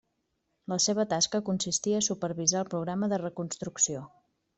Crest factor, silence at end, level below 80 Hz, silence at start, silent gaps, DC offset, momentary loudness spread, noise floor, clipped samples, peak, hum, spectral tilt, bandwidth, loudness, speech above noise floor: 18 dB; 0.5 s; -70 dBFS; 0.7 s; none; under 0.1%; 9 LU; -78 dBFS; under 0.1%; -12 dBFS; none; -3.5 dB/octave; 8.4 kHz; -29 LUFS; 49 dB